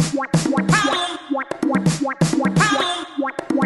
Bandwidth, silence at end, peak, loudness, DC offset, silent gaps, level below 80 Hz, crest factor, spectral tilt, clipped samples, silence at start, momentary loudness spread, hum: 12 kHz; 0 s; -2 dBFS; -19 LUFS; under 0.1%; none; -48 dBFS; 16 dB; -4.5 dB/octave; under 0.1%; 0 s; 8 LU; none